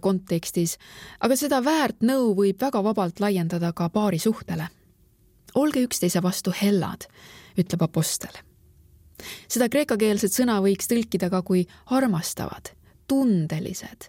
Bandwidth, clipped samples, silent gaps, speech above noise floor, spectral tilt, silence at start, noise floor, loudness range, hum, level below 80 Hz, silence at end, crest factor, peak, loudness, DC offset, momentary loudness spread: 17 kHz; under 0.1%; none; 35 dB; -5 dB/octave; 0.05 s; -59 dBFS; 3 LU; none; -56 dBFS; 0 s; 18 dB; -8 dBFS; -24 LUFS; under 0.1%; 12 LU